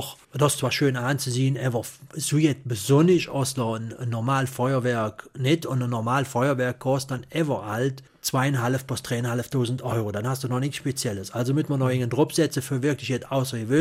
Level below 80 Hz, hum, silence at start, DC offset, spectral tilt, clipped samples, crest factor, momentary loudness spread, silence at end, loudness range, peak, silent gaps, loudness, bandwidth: -60 dBFS; none; 0 s; under 0.1%; -5.5 dB/octave; under 0.1%; 18 dB; 7 LU; 0 s; 3 LU; -6 dBFS; none; -25 LUFS; 16 kHz